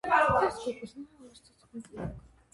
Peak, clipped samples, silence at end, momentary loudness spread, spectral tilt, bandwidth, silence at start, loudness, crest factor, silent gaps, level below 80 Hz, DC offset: -10 dBFS; under 0.1%; 0.35 s; 24 LU; -5.5 dB/octave; 11.5 kHz; 0.05 s; -29 LUFS; 22 dB; none; -54 dBFS; under 0.1%